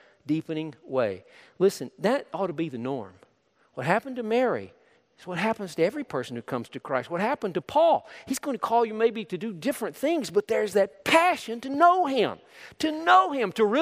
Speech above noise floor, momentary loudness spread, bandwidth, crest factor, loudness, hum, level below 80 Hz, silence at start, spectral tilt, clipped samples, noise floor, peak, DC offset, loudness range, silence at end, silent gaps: 40 dB; 13 LU; 15.5 kHz; 20 dB; -26 LUFS; none; -72 dBFS; 0.25 s; -5 dB/octave; under 0.1%; -65 dBFS; -6 dBFS; under 0.1%; 7 LU; 0 s; none